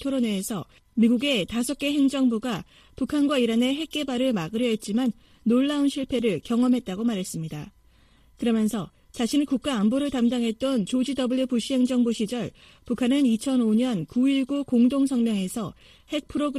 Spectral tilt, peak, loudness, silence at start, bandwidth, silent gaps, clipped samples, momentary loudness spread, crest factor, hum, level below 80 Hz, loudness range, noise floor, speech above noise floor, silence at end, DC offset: -5 dB/octave; -10 dBFS; -25 LUFS; 0 s; 14 kHz; none; under 0.1%; 11 LU; 14 dB; none; -56 dBFS; 3 LU; -57 dBFS; 33 dB; 0 s; under 0.1%